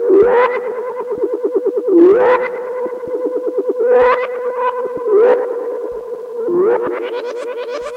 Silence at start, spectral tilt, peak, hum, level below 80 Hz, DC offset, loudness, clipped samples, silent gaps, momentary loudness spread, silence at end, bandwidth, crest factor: 0 s; -6.5 dB/octave; 0 dBFS; none; -54 dBFS; under 0.1%; -15 LUFS; under 0.1%; none; 13 LU; 0 s; 7 kHz; 14 dB